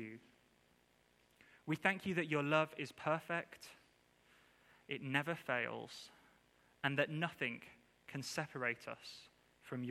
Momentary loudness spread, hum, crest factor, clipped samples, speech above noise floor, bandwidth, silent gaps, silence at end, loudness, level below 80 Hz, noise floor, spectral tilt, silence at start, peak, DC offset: 19 LU; none; 26 dB; under 0.1%; 33 dB; 15.5 kHz; none; 0 s; -40 LUFS; -82 dBFS; -73 dBFS; -5 dB/octave; 0 s; -16 dBFS; under 0.1%